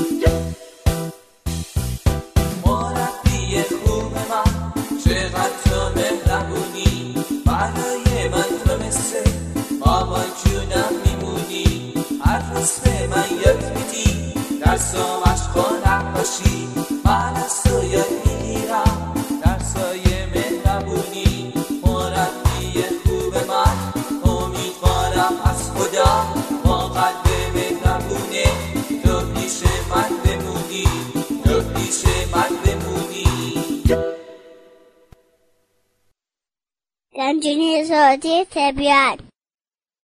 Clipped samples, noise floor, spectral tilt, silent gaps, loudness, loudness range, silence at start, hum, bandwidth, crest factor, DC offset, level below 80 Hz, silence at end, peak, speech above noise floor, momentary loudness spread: under 0.1%; under -90 dBFS; -5 dB/octave; none; -20 LUFS; 3 LU; 0 s; none; 14 kHz; 18 dB; under 0.1%; -26 dBFS; 0.8 s; 0 dBFS; over 72 dB; 7 LU